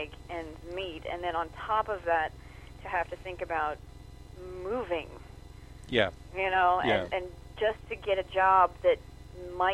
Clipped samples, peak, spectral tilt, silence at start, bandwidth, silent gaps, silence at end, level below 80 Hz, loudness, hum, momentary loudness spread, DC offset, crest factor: under 0.1%; -10 dBFS; -5.5 dB/octave; 0 s; 13.5 kHz; none; 0 s; -50 dBFS; -30 LUFS; none; 24 LU; under 0.1%; 22 dB